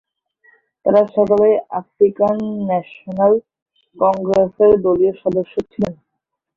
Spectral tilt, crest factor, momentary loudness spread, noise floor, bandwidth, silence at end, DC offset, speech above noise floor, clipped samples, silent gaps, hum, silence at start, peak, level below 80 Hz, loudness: -9 dB/octave; 16 dB; 10 LU; -77 dBFS; 7 kHz; 0.65 s; under 0.1%; 62 dB; under 0.1%; 3.62-3.66 s; none; 0.85 s; -2 dBFS; -52 dBFS; -16 LUFS